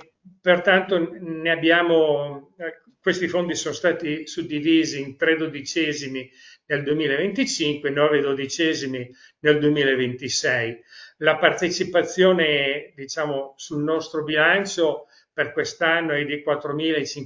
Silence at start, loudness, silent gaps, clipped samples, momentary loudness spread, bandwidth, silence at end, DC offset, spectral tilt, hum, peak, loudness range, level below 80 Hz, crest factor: 0.25 s; -22 LUFS; none; under 0.1%; 12 LU; 7.6 kHz; 0 s; under 0.1%; -4 dB/octave; none; 0 dBFS; 3 LU; -66 dBFS; 22 dB